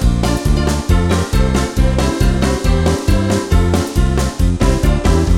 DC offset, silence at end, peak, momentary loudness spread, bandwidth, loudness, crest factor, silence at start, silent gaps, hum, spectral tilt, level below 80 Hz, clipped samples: under 0.1%; 0 s; -2 dBFS; 2 LU; 16 kHz; -15 LUFS; 12 dB; 0 s; none; none; -6 dB/octave; -16 dBFS; under 0.1%